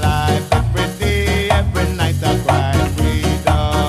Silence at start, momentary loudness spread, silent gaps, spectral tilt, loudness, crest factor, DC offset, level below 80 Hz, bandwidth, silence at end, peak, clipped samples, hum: 0 s; 2 LU; none; -5.5 dB/octave; -17 LUFS; 16 dB; under 0.1%; -24 dBFS; 15 kHz; 0 s; 0 dBFS; under 0.1%; none